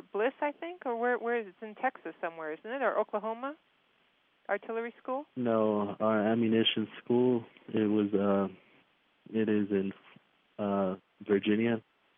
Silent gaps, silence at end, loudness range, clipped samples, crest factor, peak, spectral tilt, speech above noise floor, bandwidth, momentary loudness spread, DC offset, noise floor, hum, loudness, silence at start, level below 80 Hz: none; 0.35 s; 7 LU; under 0.1%; 18 dB; -14 dBFS; -4 dB/octave; 40 dB; 3.8 kHz; 11 LU; under 0.1%; -70 dBFS; none; -32 LUFS; 0.15 s; -86 dBFS